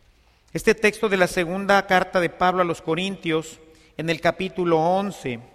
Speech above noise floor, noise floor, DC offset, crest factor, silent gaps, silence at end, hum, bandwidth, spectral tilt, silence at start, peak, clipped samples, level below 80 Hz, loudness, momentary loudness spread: 35 dB; -57 dBFS; under 0.1%; 18 dB; none; 0.1 s; none; 15 kHz; -5 dB/octave; 0.55 s; -4 dBFS; under 0.1%; -52 dBFS; -22 LUFS; 10 LU